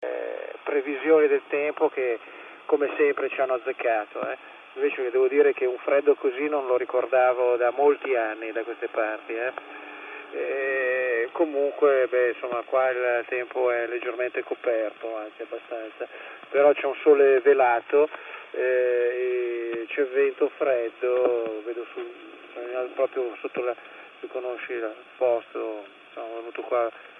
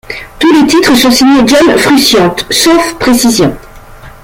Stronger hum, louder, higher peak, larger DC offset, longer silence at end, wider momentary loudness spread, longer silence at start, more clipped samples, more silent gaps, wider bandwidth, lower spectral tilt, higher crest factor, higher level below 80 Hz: neither; second, -25 LUFS vs -6 LUFS; second, -6 dBFS vs 0 dBFS; neither; second, 0 s vs 0.15 s; first, 16 LU vs 5 LU; about the same, 0 s vs 0.1 s; second, under 0.1% vs 0.1%; neither; second, 3.8 kHz vs 17 kHz; first, -6.5 dB/octave vs -3.5 dB/octave; first, 18 dB vs 8 dB; second, -88 dBFS vs -34 dBFS